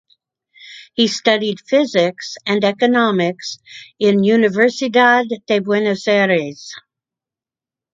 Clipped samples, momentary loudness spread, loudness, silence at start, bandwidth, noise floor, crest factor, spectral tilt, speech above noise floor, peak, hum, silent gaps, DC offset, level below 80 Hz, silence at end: under 0.1%; 15 LU; -16 LUFS; 0.65 s; 7.8 kHz; -89 dBFS; 16 dB; -5 dB/octave; 73 dB; 0 dBFS; none; none; under 0.1%; -66 dBFS; 1.15 s